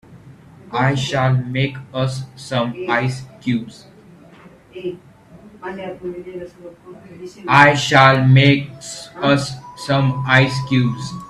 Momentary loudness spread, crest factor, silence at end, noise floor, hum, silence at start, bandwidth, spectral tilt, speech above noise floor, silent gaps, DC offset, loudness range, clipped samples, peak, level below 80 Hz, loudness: 20 LU; 18 dB; 0 s; -44 dBFS; none; 0.1 s; 11.5 kHz; -6 dB/octave; 27 dB; none; under 0.1%; 18 LU; under 0.1%; 0 dBFS; -52 dBFS; -16 LUFS